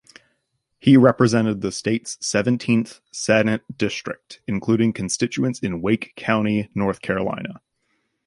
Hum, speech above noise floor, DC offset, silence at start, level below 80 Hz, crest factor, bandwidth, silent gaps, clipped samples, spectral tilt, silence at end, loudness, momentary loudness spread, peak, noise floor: none; 52 dB; under 0.1%; 0.85 s; -54 dBFS; 20 dB; 11.5 kHz; none; under 0.1%; -5.5 dB/octave; 0.7 s; -21 LUFS; 12 LU; 0 dBFS; -72 dBFS